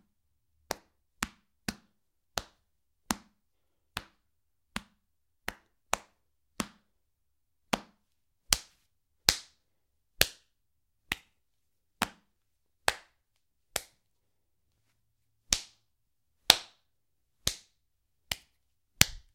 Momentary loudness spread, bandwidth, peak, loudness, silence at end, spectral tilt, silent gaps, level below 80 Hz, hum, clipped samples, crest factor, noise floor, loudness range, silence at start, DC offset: 17 LU; 16 kHz; 0 dBFS; -32 LUFS; 0.15 s; -1 dB/octave; none; -56 dBFS; none; under 0.1%; 38 dB; -82 dBFS; 11 LU; 0.7 s; under 0.1%